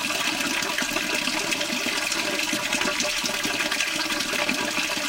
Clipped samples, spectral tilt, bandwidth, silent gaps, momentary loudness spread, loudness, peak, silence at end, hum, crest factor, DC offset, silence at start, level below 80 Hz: under 0.1%; -1 dB/octave; 17 kHz; none; 1 LU; -23 LUFS; -8 dBFS; 0 s; none; 18 dB; under 0.1%; 0 s; -54 dBFS